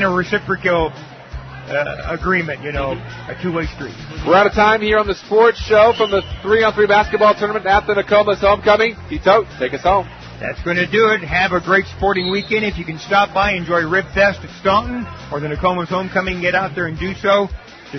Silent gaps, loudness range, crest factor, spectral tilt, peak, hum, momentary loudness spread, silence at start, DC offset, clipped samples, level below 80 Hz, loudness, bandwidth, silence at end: none; 6 LU; 16 dB; -5.5 dB/octave; 0 dBFS; none; 13 LU; 0 s; under 0.1%; under 0.1%; -36 dBFS; -16 LUFS; 6.4 kHz; 0 s